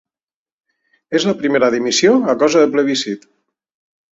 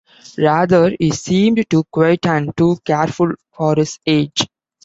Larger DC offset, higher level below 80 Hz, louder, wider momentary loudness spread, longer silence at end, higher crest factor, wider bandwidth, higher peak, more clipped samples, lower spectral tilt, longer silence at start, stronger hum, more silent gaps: neither; second, -60 dBFS vs -50 dBFS; about the same, -15 LUFS vs -16 LUFS; about the same, 8 LU vs 6 LU; first, 0.95 s vs 0.4 s; about the same, 16 dB vs 14 dB; about the same, 8 kHz vs 8 kHz; about the same, -2 dBFS vs -2 dBFS; neither; second, -3.5 dB/octave vs -6 dB/octave; first, 1.1 s vs 0.4 s; neither; neither